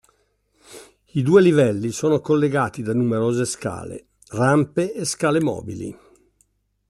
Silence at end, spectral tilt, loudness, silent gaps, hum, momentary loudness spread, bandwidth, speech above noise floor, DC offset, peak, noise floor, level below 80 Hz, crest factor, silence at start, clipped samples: 0.95 s; -6 dB/octave; -20 LUFS; none; 50 Hz at -55 dBFS; 17 LU; 12.5 kHz; 46 dB; under 0.1%; -2 dBFS; -66 dBFS; -58 dBFS; 18 dB; 0.7 s; under 0.1%